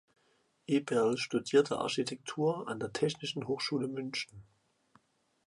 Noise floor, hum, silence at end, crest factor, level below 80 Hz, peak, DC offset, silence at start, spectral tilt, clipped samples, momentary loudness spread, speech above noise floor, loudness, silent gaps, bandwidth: -74 dBFS; none; 1.05 s; 20 dB; -74 dBFS; -14 dBFS; under 0.1%; 0.7 s; -5 dB/octave; under 0.1%; 9 LU; 41 dB; -33 LUFS; none; 11.5 kHz